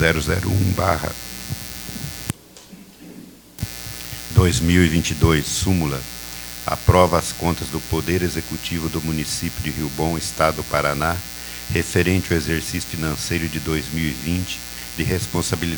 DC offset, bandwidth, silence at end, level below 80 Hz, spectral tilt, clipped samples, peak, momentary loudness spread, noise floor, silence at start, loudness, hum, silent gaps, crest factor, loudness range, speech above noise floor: under 0.1%; over 20 kHz; 0 s; -34 dBFS; -5 dB/octave; under 0.1%; 0 dBFS; 13 LU; -43 dBFS; 0 s; -21 LUFS; none; none; 22 dB; 6 LU; 23 dB